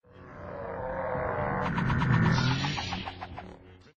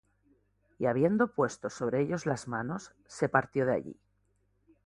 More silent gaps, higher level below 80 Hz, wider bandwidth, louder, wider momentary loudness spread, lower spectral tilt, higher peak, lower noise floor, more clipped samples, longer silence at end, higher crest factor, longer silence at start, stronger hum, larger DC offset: neither; first, -46 dBFS vs -66 dBFS; second, 7.4 kHz vs 11.5 kHz; about the same, -29 LUFS vs -31 LUFS; first, 19 LU vs 10 LU; about the same, -6.5 dB/octave vs -6.5 dB/octave; second, -12 dBFS vs -8 dBFS; second, -50 dBFS vs -73 dBFS; neither; second, 0.2 s vs 0.9 s; second, 18 dB vs 24 dB; second, 0.15 s vs 0.8 s; second, none vs 50 Hz at -60 dBFS; neither